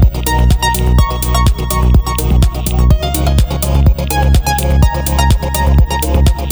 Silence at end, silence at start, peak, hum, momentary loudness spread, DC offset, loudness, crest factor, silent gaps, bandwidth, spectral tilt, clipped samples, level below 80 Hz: 0 s; 0 s; 0 dBFS; none; 2 LU; under 0.1%; -13 LUFS; 10 dB; none; over 20 kHz; -5.5 dB/octave; under 0.1%; -12 dBFS